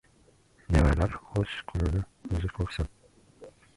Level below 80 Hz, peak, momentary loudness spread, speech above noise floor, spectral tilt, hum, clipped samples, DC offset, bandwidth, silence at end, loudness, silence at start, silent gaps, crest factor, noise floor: -34 dBFS; -10 dBFS; 10 LU; 32 dB; -7 dB/octave; none; under 0.1%; under 0.1%; 11.5 kHz; 0.3 s; -30 LUFS; 0.7 s; none; 20 dB; -62 dBFS